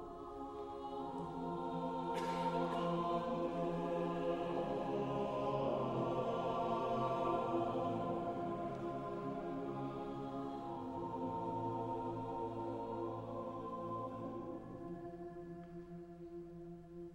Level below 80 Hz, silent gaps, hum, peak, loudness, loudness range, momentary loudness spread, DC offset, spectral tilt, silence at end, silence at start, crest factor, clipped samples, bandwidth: -64 dBFS; none; none; -24 dBFS; -41 LUFS; 7 LU; 12 LU; under 0.1%; -7.5 dB/octave; 0 s; 0 s; 16 dB; under 0.1%; 12 kHz